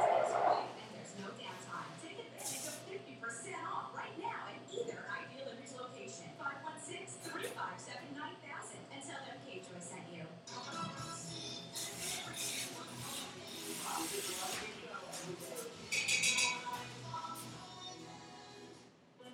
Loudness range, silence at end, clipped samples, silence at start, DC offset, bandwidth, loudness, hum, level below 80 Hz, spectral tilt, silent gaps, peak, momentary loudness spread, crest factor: 9 LU; 0 s; under 0.1%; 0 s; under 0.1%; 17.5 kHz; -41 LUFS; none; -80 dBFS; -2 dB/octave; none; -20 dBFS; 15 LU; 24 dB